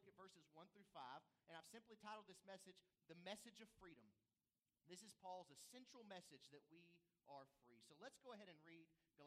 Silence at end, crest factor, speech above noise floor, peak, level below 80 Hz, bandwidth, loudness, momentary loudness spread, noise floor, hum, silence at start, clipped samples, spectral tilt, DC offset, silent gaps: 0 s; 24 dB; over 26 dB; -42 dBFS; under -90 dBFS; 15 kHz; -63 LUFS; 9 LU; under -90 dBFS; none; 0 s; under 0.1%; -3 dB/octave; under 0.1%; none